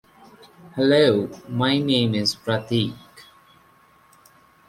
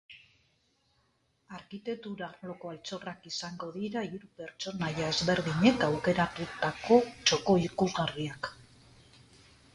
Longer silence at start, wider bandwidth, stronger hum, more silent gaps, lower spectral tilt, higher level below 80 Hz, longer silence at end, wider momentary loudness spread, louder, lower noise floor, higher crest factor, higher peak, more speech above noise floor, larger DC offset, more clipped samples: first, 0.65 s vs 0.1 s; first, 15.5 kHz vs 11.5 kHz; neither; neither; about the same, -5.5 dB/octave vs -4.5 dB/octave; about the same, -60 dBFS vs -60 dBFS; first, 1.45 s vs 1.1 s; second, 12 LU vs 16 LU; first, -21 LUFS vs -31 LUFS; second, -55 dBFS vs -73 dBFS; about the same, 20 dB vs 22 dB; first, -4 dBFS vs -10 dBFS; second, 35 dB vs 42 dB; neither; neither